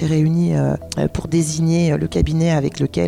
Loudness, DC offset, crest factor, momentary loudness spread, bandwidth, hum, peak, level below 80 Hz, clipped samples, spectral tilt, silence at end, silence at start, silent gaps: -18 LUFS; under 0.1%; 12 dB; 5 LU; 12.5 kHz; none; -6 dBFS; -32 dBFS; under 0.1%; -6.5 dB/octave; 0 s; 0 s; none